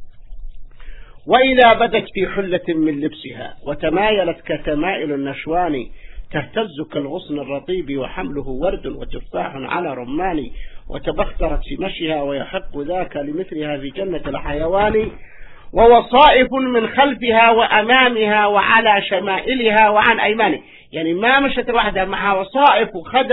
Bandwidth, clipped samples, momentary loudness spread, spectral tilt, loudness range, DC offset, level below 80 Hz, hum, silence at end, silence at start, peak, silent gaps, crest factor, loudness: 5.4 kHz; under 0.1%; 15 LU; -8 dB/octave; 11 LU; under 0.1%; -34 dBFS; none; 0 s; 0 s; 0 dBFS; none; 18 dB; -17 LUFS